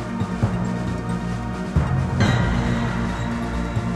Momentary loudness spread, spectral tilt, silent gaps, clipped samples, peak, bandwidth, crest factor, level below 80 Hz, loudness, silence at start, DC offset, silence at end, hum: 6 LU; -7 dB/octave; none; under 0.1%; -6 dBFS; 12 kHz; 16 dB; -32 dBFS; -23 LUFS; 0 s; under 0.1%; 0 s; none